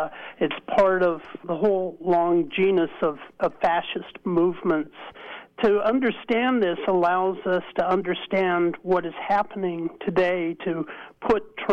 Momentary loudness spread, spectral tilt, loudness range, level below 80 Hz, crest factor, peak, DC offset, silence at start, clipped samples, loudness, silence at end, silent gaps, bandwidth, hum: 10 LU; -7.5 dB/octave; 2 LU; -58 dBFS; 14 dB; -10 dBFS; under 0.1%; 0 s; under 0.1%; -24 LUFS; 0 s; none; 6.4 kHz; none